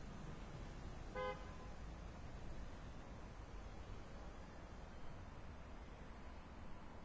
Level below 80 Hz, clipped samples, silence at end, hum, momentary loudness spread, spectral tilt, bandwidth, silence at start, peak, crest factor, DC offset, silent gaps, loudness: -56 dBFS; under 0.1%; 0 s; none; 8 LU; -6 dB/octave; 8 kHz; 0 s; -34 dBFS; 18 dB; under 0.1%; none; -54 LUFS